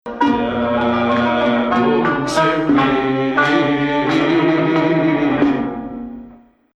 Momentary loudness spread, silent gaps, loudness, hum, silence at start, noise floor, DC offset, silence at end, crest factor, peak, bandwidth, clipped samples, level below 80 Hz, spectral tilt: 6 LU; none; -16 LUFS; none; 0.05 s; -43 dBFS; under 0.1%; 0.4 s; 14 dB; -2 dBFS; 11 kHz; under 0.1%; -46 dBFS; -6 dB/octave